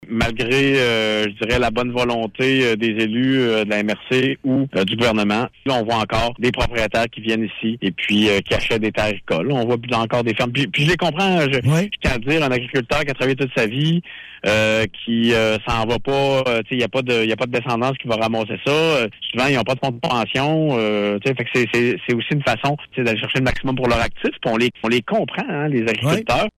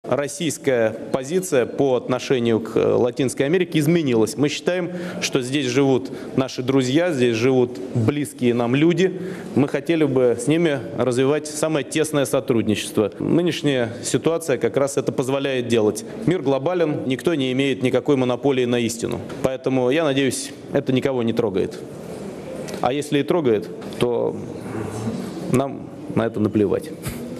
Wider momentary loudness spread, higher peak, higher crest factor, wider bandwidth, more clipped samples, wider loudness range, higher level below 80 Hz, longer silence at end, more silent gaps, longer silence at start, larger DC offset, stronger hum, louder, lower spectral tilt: second, 5 LU vs 8 LU; second, -6 dBFS vs -2 dBFS; second, 12 dB vs 20 dB; first, 15.5 kHz vs 14 kHz; neither; second, 1 LU vs 4 LU; first, -40 dBFS vs -56 dBFS; about the same, 0.1 s vs 0 s; neither; about the same, 0 s vs 0.05 s; neither; neither; about the same, -19 LUFS vs -21 LUFS; about the same, -5.5 dB/octave vs -5.5 dB/octave